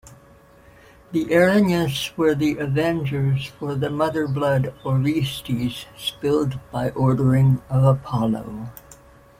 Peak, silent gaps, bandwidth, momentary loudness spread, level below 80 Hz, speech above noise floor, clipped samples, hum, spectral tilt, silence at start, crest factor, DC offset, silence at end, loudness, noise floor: -4 dBFS; none; 16 kHz; 10 LU; -48 dBFS; 29 dB; under 0.1%; none; -7 dB/octave; 0.1 s; 16 dB; under 0.1%; 0.45 s; -21 LUFS; -50 dBFS